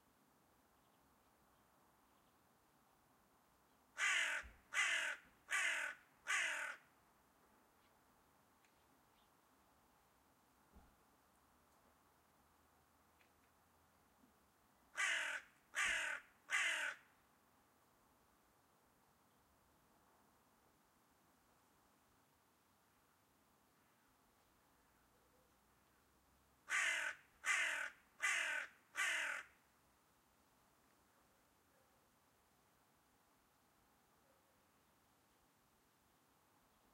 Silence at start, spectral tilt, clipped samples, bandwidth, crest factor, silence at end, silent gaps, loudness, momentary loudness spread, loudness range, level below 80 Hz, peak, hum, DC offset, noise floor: 3.95 s; 1.5 dB/octave; under 0.1%; 16 kHz; 24 dB; 7.45 s; none; -41 LUFS; 12 LU; 7 LU; -82 dBFS; -26 dBFS; none; under 0.1%; -76 dBFS